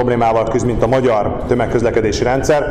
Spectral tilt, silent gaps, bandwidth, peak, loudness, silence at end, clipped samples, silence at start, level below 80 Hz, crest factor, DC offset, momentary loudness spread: -6 dB/octave; none; 14.5 kHz; 0 dBFS; -15 LUFS; 0 s; under 0.1%; 0 s; -30 dBFS; 14 dB; under 0.1%; 3 LU